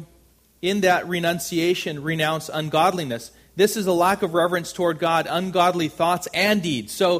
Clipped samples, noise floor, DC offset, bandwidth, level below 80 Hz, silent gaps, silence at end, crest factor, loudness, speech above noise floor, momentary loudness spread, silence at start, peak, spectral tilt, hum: under 0.1%; -56 dBFS; under 0.1%; 15.5 kHz; -58 dBFS; none; 0 s; 18 dB; -22 LUFS; 35 dB; 6 LU; 0 s; -4 dBFS; -4.5 dB/octave; none